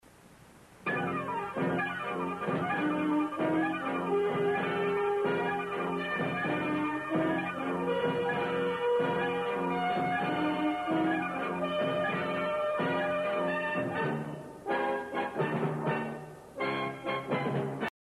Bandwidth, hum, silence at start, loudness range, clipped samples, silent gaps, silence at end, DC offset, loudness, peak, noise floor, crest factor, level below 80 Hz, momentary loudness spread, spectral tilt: 13 kHz; none; 0.25 s; 3 LU; under 0.1%; none; 0.15 s; under 0.1%; -31 LUFS; -18 dBFS; -56 dBFS; 14 dB; -68 dBFS; 5 LU; -7 dB/octave